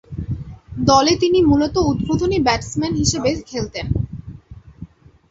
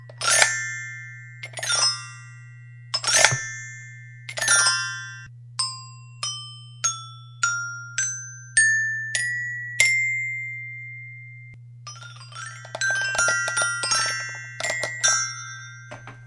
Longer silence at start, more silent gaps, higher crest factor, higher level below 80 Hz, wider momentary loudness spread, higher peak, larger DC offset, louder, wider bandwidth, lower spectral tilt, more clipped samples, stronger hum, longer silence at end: about the same, 0.1 s vs 0 s; neither; second, 18 dB vs 26 dB; first, -34 dBFS vs -64 dBFS; second, 16 LU vs 22 LU; about the same, 0 dBFS vs 0 dBFS; neither; first, -18 LUFS vs -22 LUFS; second, 8.2 kHz vs 12 kHz; first, -5 dB/octave vs 0.5 dB/octave; neither; neither; first, 0.45 s vs 0 s